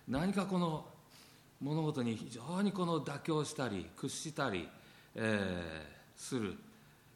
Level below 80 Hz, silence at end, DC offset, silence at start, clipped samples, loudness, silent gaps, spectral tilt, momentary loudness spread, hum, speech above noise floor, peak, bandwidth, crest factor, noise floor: -66 dBFS; 0.25 s; under 0.1%; 0.05 s; under 0.1%; -38 LUFS; none; -5.5 dB/octave; 17 LU; none; 24 dB; -20 dBFS; 17 kHz; 20 dB; -61 dBFS